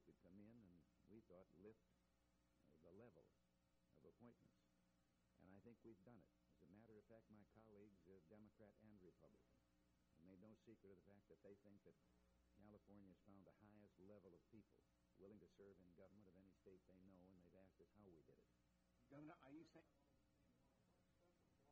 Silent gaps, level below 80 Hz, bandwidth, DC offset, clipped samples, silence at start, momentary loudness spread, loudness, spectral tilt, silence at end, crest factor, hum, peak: none; -88 dBFS; 4.6 kHz; under 0.1%; under 0.1%; 0 s; 5 LU; -68 LUFS; -7 dB/octave; 0 s; 18 dB; none; -52 dBFS